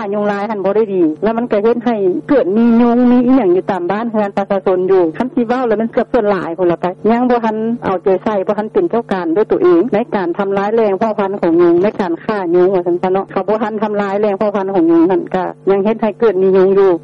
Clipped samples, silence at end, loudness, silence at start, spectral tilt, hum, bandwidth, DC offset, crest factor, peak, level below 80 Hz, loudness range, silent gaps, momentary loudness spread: under 0.1%; 0 s; -14 LUFS; 0 s; -9 dB/octave; none; 6.2 kHz; under 0.1%; 8 dB; -4 dBFS; -50 dBFS; 2 LU; none; 6 LU